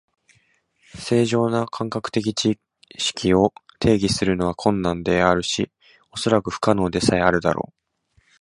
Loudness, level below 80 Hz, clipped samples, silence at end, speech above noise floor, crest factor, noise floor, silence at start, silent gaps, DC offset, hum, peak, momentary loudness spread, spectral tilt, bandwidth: -21 LUFS; -44 dBFS; under 0.1%; 0.8 s; 43 dB; 22 dB; -64 dBFS; 0.95 s; none; under 0.1%; none; 0 dBFS; 9 LU; -5 dB/octave; 11.5 kHz